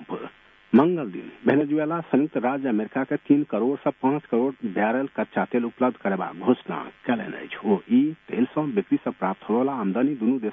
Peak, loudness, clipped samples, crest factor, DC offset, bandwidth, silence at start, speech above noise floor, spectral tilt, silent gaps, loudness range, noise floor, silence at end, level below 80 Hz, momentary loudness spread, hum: -6 dBFS; -24 LUFS; under 0.1%; 18 dB; under 0.1%; 3.8 kHz; 0 s; 20 dB; -10 dB/octave; none; 2 LU; -44 dBFS; 0 s; -70 dBFS; 7 LU; none